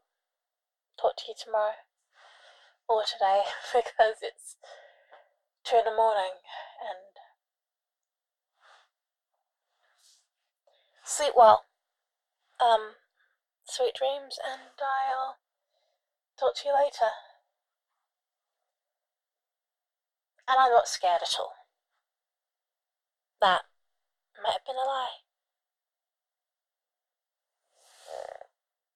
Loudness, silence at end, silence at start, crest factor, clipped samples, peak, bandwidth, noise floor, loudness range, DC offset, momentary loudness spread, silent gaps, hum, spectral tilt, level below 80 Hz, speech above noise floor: -27 LUFS; 0.7 s; 1 s; 26 dB; under 0.1%; -6 dBFS; 13.5 kHz; under -90 dBFS; 11 LU; under 0.1%; 20 LU; none; none; -0.5 dB/octave; -78 dBFS; over 63 dB